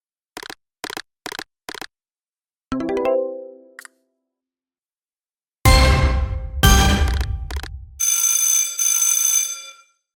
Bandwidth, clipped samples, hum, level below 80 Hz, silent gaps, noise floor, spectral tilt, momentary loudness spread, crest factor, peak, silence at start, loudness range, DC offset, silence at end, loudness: 19 kHz; under 0.1%; none; -26 dBFS; 2.29-2.33 s; under -90 dBFS; -3 dB/octave; 21 LU; 20 dB; 0 dBFS; 0.35 s; 11 LU; under 0.1%; 0.45 s; -17 LUFS